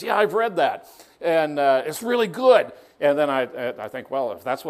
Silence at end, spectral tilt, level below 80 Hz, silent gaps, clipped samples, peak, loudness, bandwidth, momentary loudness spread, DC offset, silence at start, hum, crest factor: 0 s; -4.5 dB/octave; -72 dBFS; none; under 0.1%; -4 dBFS; -22 LUFS; 15.5 kHz; 12 LU; under 0.1%; 0 s; none; 18 dB